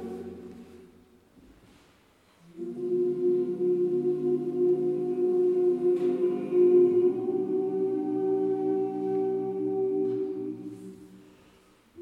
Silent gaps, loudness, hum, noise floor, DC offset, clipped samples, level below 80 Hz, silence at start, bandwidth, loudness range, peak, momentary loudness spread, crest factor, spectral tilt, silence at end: none; -27 LUFS; none; -61 dBFS; under 0.1%; under 0.1%; -72 dBFS; 0 s; 3.5 kHz; 7 LU; -12 dBFS; 16 LU; 16 dB; -9.5 dB/octave; 0 s